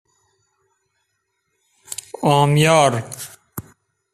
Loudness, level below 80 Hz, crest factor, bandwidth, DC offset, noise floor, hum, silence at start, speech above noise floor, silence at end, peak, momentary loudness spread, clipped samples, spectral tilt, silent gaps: -16 LUFS; -56 dBFS; 20 dB; 15 kHz; under 0.1%; -72 dBFS; none; 1.9 s; 57 dB; 0.5 s; -2 dBFS; 22 LU; under 0.1%; -5 dB/octave; none